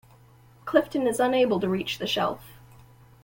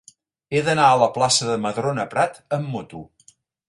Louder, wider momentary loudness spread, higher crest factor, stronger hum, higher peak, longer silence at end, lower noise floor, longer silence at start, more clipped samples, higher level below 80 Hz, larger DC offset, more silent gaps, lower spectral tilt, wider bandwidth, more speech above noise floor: second, -25 LUFS vs -20 LUFS; second, 7 LU vs 15 LU; about the same, 20 dB vs 20 dB; neither; second, -6 dBFS vs -2 dBFS; about the same, 0.7 s vs 0.65 s; about the same, -54 dBFS vs -57 dBFS; first, 0.65 s vs 0.5 s; neither; about the same, -60 dBFS vs -60 dBFS; neither; neither; first, -5 dB/octave vs -3.5 dB/octave; first, 17 kHz vs 11.5 kHz; second, 30 dB vs 36 dB